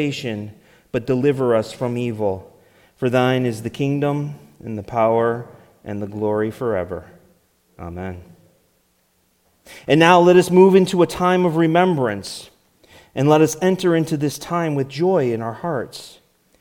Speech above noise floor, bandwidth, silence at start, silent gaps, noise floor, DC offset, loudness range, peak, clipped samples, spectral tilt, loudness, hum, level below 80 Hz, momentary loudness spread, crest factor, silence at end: 45 dB; 17.5 kHz; 0 s; none; -63 dBFS; under 0.1%; 12 LU; 0 dBFS; under 0.1%; -6 dB/octave; -18 LUFS; none; -56 dBFS; 20 LU; 20 dB; 0.5 s